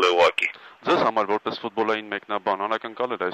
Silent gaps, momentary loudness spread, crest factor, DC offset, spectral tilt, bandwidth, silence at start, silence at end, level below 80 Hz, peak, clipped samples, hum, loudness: none; 9 LU; 18 dB; under 0.1%; -4 dB/octave; 13 kHz; 0 s; 0 s; -68 dBFS; -6 dBFS; under 0.1%; none; -24 LUFS